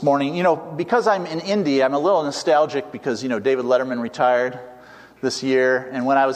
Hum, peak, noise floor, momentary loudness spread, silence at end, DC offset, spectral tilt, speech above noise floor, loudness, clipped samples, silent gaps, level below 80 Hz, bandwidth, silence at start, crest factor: none; -4 dBFS; -44 dBFS; 8 LU; 0 s; under 0.1%; -5 dB/octave; 25 dB; -20 LUFS; under 0.1%; none; -66 dBFS; 11.5 kHz; 0 s; 16 dB